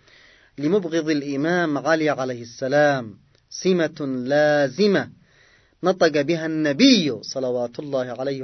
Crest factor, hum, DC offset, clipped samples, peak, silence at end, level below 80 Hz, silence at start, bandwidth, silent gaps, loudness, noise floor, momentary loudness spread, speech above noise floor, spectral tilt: 18 dB; none; under 0.1%; under 0.1%; -2 dBFS; 0 s; -66 dBFS; 0.6 s; 6.4 kHz; none; -21 LUFS; -56 dBFS; 10 LU; 36 dB; -5 dB/octave